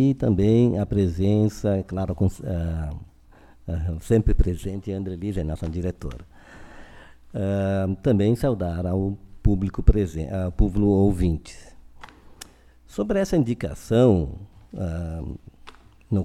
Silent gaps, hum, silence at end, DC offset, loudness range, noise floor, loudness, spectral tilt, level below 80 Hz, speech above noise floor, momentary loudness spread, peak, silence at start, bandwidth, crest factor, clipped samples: none; none; 0 s; under 0.1%; 4 LU; -51 dBFS; -24 LUFS; -8.5 dB/octave; -30 dBFS; 29 dB; 17 LU; 0 dBFS; 0 s; 13.5 kHz; 22 dB; under 0.1%